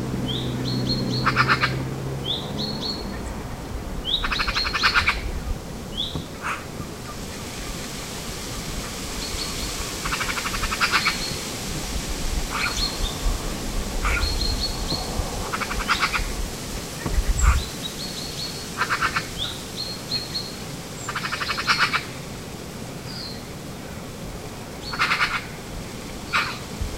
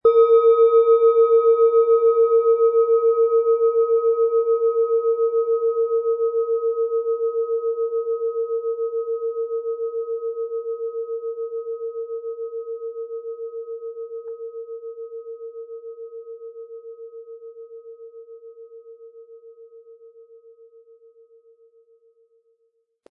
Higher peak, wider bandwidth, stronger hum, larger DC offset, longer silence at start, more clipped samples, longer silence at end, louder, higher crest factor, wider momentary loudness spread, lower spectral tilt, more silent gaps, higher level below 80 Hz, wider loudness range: about the same, -4 dBFS vs -6 dBFS; first, 16 kHz vs 3.8 kHz; neither; first, 0.2% vs under 0.1%; about the same, 0 s vs 0.05 s; neither; second, 0 s vs 3 s; second, -26 LUFS vs -20 LUFS; first, 22 dB vs 16 dB; second, 13 LU vs 23 LU; second, -3 dB/octave vs -7 dB/octave; neither; first, -32 dBFS vs -78 dBFS; second, 5 LU vs 22 LU